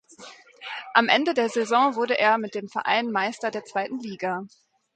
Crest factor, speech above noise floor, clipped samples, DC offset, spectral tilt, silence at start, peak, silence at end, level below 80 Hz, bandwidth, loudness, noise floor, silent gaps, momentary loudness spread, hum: 22 dB; 23 dB; under 0.1%; under 0.1%; -3.5 dB/octave; 0.2 s; -2 dBFS; 0.5 s; -76 dBFS; 9.2 kHz; -24 LUFS; -47 dBFS; none; 13 LU; none